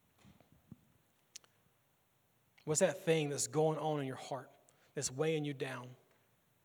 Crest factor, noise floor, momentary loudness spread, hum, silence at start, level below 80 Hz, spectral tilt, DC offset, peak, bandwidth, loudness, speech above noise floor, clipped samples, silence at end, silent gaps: 22 dB; -75 dBFS; 23 LU; none; 0.7 s; -82 dBFS; -4.5 dB/octave; under 0.1%; -18 dBFS; over 20 kHz; -37 LUFS; 39 dB; under 0.1%; 0.7 s; none